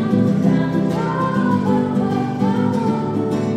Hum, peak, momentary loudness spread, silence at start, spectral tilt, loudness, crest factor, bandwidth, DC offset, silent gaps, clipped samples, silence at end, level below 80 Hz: none; -4 dBFS; 4 LU; 0 s; -8.5 dB/octave; -18 LUFS; 14 dB; 9.6 kHz; under 0.1%; none; under 0.1%; 0 s; -52 dBFS